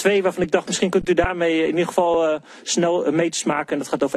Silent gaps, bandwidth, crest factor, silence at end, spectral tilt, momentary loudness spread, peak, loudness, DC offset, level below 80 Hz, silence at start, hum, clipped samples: none; 13 kHz; 16 dB; 0 s; -4 dB/octave; 4 LU; -4 dBFS; -20 LUFS; under 0.1%; -44 dBFS; 0 s; none; under 0.1%